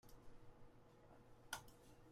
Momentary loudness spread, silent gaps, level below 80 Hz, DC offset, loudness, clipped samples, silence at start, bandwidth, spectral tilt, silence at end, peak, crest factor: 15 LU; none; -70 dBFS; under 0.1%; -60 LUFS; under 0.1%; 0.05 s; 16 kHz; -2.5 dB/octave; 0 s; -32 dBFS; 28 dB